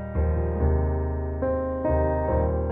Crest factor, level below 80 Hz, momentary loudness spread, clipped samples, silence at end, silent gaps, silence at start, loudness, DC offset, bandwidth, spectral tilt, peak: 12 dB; -28 dBFS; 4 LU; under 0.1%; 0 s; none; 0 s; -25 LUFS; under 0.1%; 2.7 kHz; -13 dB/octave; -12 dBFS